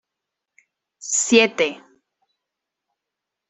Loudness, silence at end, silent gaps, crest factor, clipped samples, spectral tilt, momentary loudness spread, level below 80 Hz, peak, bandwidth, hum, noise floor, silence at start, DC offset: -18 LUFS; 1.7 s; none; 24 dB; under 0.1%; -1.5 dB/octave; 10 LU; -70 dBFS; -2 dBFS; 8.4 kHz; none; -84 dBFS; 1 s; under 0.1%